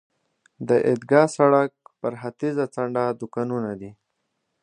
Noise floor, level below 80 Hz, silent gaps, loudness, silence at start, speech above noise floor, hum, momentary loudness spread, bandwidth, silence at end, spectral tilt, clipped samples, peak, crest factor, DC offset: -76 dBFS; -68 dBFS; none; -23 LUFS; 0.6 s; 54 dB; none; 14 LU; 10.5 kHz; 0.7 s; -7 dB/octave; under 0.1%; -2 dBFS; 22 dB; under 0.1%